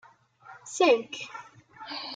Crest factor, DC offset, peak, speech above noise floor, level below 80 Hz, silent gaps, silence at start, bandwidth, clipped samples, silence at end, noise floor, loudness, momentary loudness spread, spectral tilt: 20 dB; under 0.1%; -10 dBFS; 26 dB; -82 dBFS; none; 0.45 s; 9.4 kHz; under 0.1%; 0 s; -53 dBFS; -27 LUFS; 23 LU; -2 dB/octave